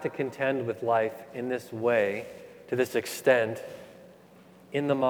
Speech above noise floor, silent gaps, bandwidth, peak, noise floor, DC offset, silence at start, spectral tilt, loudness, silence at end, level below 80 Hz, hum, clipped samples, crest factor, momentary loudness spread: 26 dB; none; over 20 kHz; -8 dBFS; -54 dBFS; under 0.1%; 0 s; -5.5 dB/octave; -28 LUFS; 0 s; -76 dBFS; none; under 0.1%; 20 dB; 15 LU